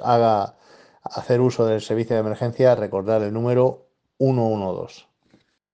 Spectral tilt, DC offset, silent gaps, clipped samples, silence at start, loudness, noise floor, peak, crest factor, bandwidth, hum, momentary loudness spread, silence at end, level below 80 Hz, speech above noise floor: -8 dB/octave; under 0.1%; none; under 0.1%; 0 s; -21 LUFS; -61 dBFS; -4 dBFS; 18 dB; 9 kHz; none; 14 LU; 0.75 s; -66 dBFS; 41 dB